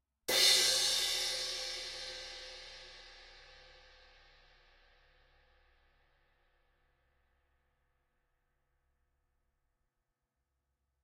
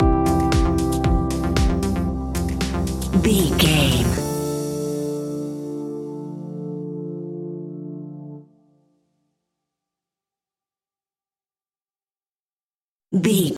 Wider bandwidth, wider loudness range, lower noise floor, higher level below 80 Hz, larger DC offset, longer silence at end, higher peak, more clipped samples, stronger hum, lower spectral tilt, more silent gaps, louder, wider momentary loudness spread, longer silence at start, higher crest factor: about the same, 16 kHz vs 16.5 kHz; first, 25 LU vs 16 LU; about the same, -87 dBFS vs under -90 dBFS; second, -68 dBFS vs -30 dBFS; neither; first, 7.5 s vs 0 s; second, -14 dBFS vs -4 dBFS; neither; neither; second, 1.5 dB/octave vs -5.5 dB/octave; second, none vs 12.65-12.69 s, 12.84-12.96 s; second, -30 LUFS vs -22 LUFS; first, 25 LU vs 15 LU; first, 0.3 s vs 0 s; first, 26 dB vs 18 dB